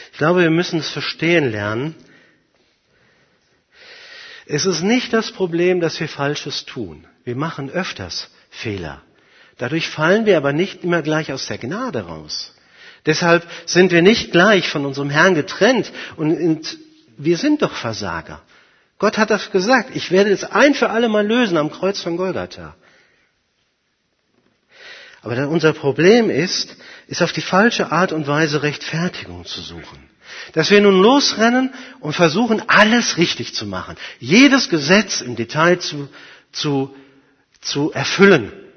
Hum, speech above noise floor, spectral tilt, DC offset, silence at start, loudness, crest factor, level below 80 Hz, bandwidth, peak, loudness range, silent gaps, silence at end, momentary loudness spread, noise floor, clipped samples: none; 50 dB; -4.5 dB/octave; under 0.1%; 0 s; -17 LUFS; 18 dB; -56 dBFS; 6.6 kHz; 0 dBFS; 9 LU; none; 0.15 s; 17 LU; -67 dBFS; under 0.1%